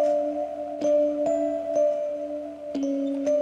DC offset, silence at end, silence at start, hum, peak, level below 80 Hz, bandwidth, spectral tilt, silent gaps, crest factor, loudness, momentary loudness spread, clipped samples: under 0.1%; 0 s; 0 s; none; -14 dBFS; -64 dBFS; 7.8 kHz; -5.5 dB/octave; none; 12 dB; -26 LUFS; 9 LU; under 0.1%